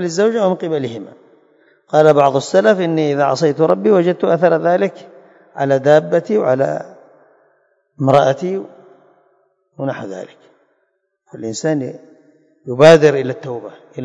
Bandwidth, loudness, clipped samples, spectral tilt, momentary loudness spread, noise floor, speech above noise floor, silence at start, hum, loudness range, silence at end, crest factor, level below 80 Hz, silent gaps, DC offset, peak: 11 kHz; -14 LUFS; 0.3%; -6 dB/octave; 18 LU; -67 dBFS; 53 dB; 0 s; none; 12 LU; 0 s; 16 dB; -60 dBFS; none; under 0.1%; 0 dBFS